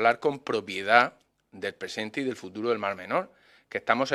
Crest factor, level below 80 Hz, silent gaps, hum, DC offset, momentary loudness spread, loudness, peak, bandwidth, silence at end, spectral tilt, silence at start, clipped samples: 26 dB; -76 dBFS; none; none; under 0.1%; 14 LU; -28 LUFS; -2 dBFS; 13 kHz; 0 s; -4.5 dB/octave; 0 s; under 0.1%